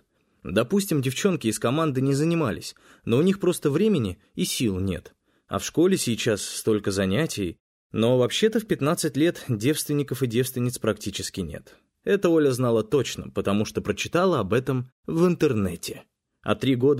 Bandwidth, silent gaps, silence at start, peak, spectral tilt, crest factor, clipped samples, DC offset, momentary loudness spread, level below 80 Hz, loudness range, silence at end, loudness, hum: 16 kHz; 7.60-7.90 s, 14.92-15.03 s; 0.45 s; -8 dBFS; -5.5 dB/octave; 16 dB; under 0.1%; under 0.1%; 10 LU; -54 dBFS; 2 LU; 0 s; -24 LUFS; none